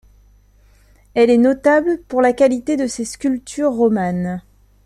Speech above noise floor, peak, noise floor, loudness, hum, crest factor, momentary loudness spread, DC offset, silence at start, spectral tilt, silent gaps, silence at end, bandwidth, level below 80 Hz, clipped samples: 35 dB; -2 dBFS; -51 dBFS; -17 LUFS; 50 Hz at -50 dBFS; 16 dB; 10 LU; under 0.1%; 1.15 s; -6 dB/octave; none; 0.45 s; 12.5 kHz; -50 dBFS; under 0.1%